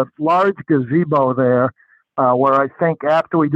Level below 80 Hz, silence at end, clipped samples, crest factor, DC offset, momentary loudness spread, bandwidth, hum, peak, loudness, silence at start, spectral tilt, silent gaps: -66 dBFS; 0 s; under 0.1%; 14 dB; under 0.1%; 4 LU; 7.8 kHz; none; -2 dBFS; -16 LUFS; 0 s; -9 dB/octave; none